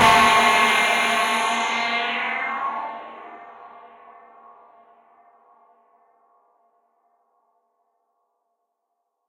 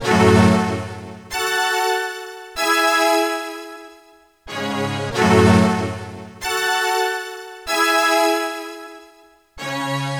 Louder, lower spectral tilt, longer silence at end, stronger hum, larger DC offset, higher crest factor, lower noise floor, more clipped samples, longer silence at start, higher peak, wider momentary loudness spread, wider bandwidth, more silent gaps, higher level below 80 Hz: about the same, -19 LUFS vs -18 LUFS; second, -1.5 dB/octave vs -4.5 dB/octave; first, 5.4 s vs 0 s; neither; neither; about the same, 22 dB vs 20 dB; first, -77 dBFS vs -51 dBFS; neither; about the same, 0 s vs 0 s; about the same, -2 dBFS vs 0 dBFS; first, 25 LU vs 18 LU; second, 16 kHz vs over 20 kHz; neither; second, -56 dBFS vs -48 dBFS